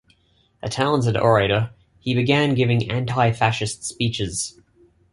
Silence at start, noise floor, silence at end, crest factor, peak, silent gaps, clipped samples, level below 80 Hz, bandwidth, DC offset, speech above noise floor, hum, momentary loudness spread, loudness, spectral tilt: 0.65 s; -61 dBFS; 0.65 s; 18 dB; -2 dBFS; none; under 0.1%; -48 dBFS; 11.5 kHz; under 0.1%; 41 dB; none; 12 LU; -21 LUFS; -5 dB/octave